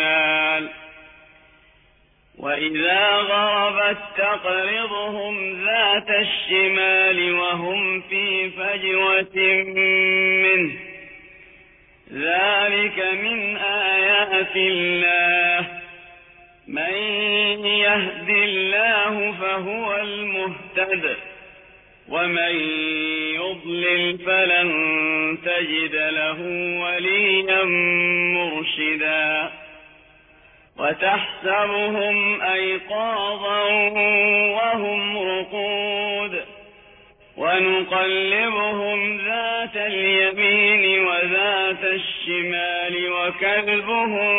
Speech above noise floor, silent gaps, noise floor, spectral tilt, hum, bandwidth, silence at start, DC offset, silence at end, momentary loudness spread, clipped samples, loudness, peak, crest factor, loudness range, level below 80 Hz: 37 dB; none; -57 dBFS; -6.5 dB/octave; none; 4 kHz; 0 s; under 0.1%; 0 s; 9 LU; under 0.1%; -19 LUFS; -6 dBFS; 16 dB; 5 LU; -62 dBFS